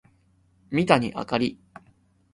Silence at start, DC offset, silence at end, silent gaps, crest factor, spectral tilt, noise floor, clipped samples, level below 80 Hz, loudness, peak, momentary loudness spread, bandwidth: 0.7 s; under 0.1%; 0.8 s; none; 24 dB; -6 dB/octave; -63 dBFS; under 0.1%; -58 dBFS; -24 LUFS; -2 dBFS; 8 LU; 11.5 kHz